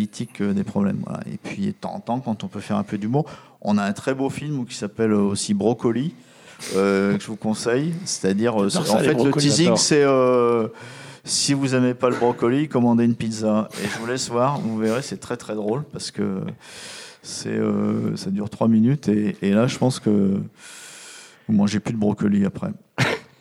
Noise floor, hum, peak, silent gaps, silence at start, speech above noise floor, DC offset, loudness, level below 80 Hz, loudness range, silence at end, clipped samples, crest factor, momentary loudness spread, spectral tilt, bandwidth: -43 dBFS; none; -4 dBFS; none; 0 s; 22 dB; under 0.1%; -22 LUFS; -62 dBFS; 7 LU; 0.15 s; under 0.1%; 18 dB; 14 LU; -5 dB/octave; 14 kHz